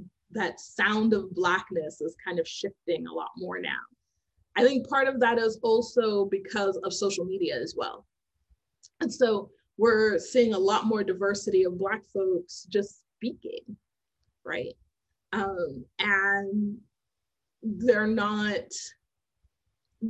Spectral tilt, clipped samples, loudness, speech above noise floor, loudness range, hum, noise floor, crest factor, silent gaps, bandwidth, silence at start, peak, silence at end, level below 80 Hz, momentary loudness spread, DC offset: -4.5 dB/octave; under 0.1%; -27 LUFS; 60 dB; 6 LU; none; -87 dBFS; 20 dB; none; 8.8 kHz; 0 s; -8 dBFS; 0 s; -66 dBFS; 13 LU; under 0.1%